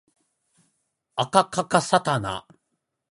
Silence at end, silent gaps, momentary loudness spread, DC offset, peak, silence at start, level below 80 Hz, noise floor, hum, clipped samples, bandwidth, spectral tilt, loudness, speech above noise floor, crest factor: 0.75 s; none; 12 LU; under 0.1%; -2 dBFS; 1.15 s; -60 dBFS; -78 dBFS; none; under 0.1%; 11.5 kHz; -4 dB/octave; -23 LUFS; 56 dB; 24 dB